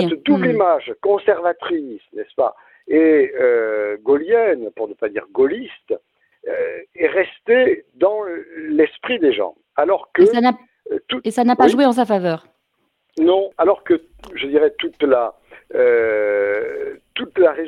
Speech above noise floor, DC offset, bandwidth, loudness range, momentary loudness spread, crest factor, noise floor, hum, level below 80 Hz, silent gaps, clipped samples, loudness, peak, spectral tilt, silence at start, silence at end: 52 dB; under 0.1%; 11.5 kHz; 3 LU; 14 LU; 18 dB; -69 dBFS; none; -60 dBFS; none; under 0.1%; -18 LUFS; 0 dBFS; -6 dB/octave; 0 s; 0 s